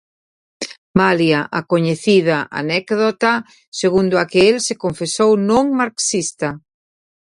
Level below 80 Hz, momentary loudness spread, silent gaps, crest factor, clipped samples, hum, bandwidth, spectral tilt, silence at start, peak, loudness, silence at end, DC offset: -54 dBFS; 11 LU; 0.78-0.94 s, 3.67-3.72 s; 18 dB; under 0.1%; none; 11.5 kHz; -4.5 dB/octave; 0.6 s; 0 dBFS; -16 LUFS; 0.8 s; under 0.1%